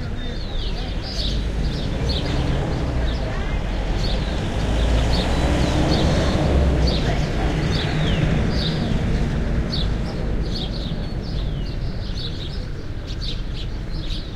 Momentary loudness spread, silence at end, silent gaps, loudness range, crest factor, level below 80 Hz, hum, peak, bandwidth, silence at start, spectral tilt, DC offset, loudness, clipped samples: 10 LU; 0 s; none; 7 LU; 16 dB; -24 dBFS; none; -6 dBFS; 11 kHz; 0 s; -6 dB/octave; under 0.1%; -23 LUFS; under 0.1%